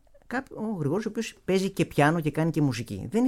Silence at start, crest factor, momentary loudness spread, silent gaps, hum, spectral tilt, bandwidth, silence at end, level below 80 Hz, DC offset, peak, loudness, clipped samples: 0.3 s; 18 dB; 10 LU; none; none; -6.5 dB/octave; 15.5 kHz; 0 s; -56 dBFS; under 0.1%; -8 dBFS; -27 LUFS; under 0.1%